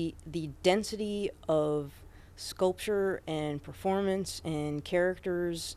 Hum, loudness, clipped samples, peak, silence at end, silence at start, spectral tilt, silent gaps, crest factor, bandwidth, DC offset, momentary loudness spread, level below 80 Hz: none; -32 LUFS; under 0.1%; -12 dBFS; 0 s; 0 s; -5 dB/octave; none; 20 dB; 15.5 kHz; under 0.1%; 8 LU; -54 dBFS